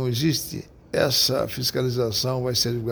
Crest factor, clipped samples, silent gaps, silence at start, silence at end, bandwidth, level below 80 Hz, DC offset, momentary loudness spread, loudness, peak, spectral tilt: 16 dB; under 0.1%; none; 0 s; 0 s; over 20 kHz; -50 dBFS; under 0.1%; 9 LU; -23 LUFS; -8 dBFS; -4 dB/octave